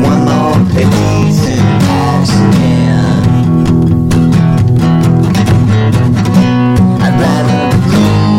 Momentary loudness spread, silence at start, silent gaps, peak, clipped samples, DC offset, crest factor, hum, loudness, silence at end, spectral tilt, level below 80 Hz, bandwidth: 1 LU; 0 s; none; 0 dBFS; under 0.1%; 0.5%; 8 dB; none; -9 LUFS; 0 s; -7 dB/octave; -28 dBFS; 15.5 kHz